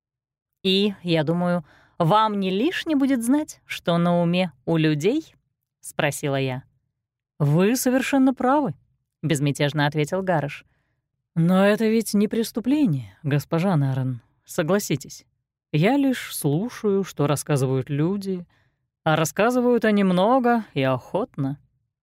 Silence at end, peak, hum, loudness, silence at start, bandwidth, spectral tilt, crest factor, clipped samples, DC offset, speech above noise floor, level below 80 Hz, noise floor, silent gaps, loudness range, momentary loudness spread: 0.45 s; -6 dBFS; none; -22 LUFS; 0.65 s; 16 kHz; -6 dB/octave; 16 dB; under 0.1%; under 0.1%; 61 dB; -62 dBFS; -83 dBFS; none; 3 LU; 10 LU